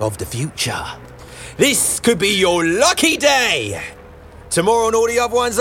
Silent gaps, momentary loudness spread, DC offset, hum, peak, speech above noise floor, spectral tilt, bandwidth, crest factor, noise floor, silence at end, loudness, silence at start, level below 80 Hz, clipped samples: none; 16 LU; under 0.1%; none; -2 dBFS; 22 dB; -2.5 dB/octave; 17 kHz; 16 dB; -39 dBFS; 0 s; -16 LUFS; 0 s; -44 dBFS; under 0.1%